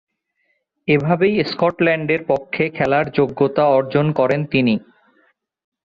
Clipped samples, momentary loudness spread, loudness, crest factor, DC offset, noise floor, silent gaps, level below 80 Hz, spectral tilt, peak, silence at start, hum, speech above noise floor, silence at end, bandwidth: under 0.1%; 4 LU; -18 LUFS; 16 dB; under 0.1%; -68 dBFS; none; -54 dBFS; -8.5 dB/octave; -2 dBFS; 0.85 s; none; 51 dB; 1.05 s; 7 kHz